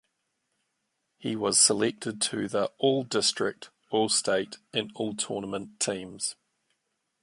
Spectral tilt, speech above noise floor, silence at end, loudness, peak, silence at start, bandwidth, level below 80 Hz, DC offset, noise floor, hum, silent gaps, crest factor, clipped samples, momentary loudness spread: -2.5 dB/octave; 51 dB; 0.9 s; -27 LUFS; -8 dBFS; 1.2 s; 11.5 kHz; -70 dBFS; under 0.1%; -79 dBFS; none; none; 22 dB; under 0.1%; 12 LU